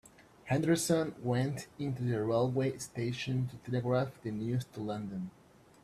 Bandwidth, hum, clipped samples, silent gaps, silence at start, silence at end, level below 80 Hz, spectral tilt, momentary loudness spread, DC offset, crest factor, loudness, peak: 14 kHz; none; under 0.1%; none; 0.2 s; 0.55 s; -66 dBFS; -6 dB/octave; 9 LU; under 0.1%; 18 dB; -34 LUFS; -14 dBFS